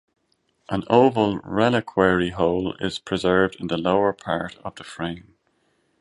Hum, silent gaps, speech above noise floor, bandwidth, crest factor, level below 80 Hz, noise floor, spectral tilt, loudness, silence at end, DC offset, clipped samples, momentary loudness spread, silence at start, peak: none; none; 47 dB; 11.5 kHz; 20 dB; -50 dBFS; -69 dBFS; -6.5 dB/octave; -22 LUFS; 0.8 s; under 0.1%; under 0.1%; 13 LU; 0.7 s; -2 dBFS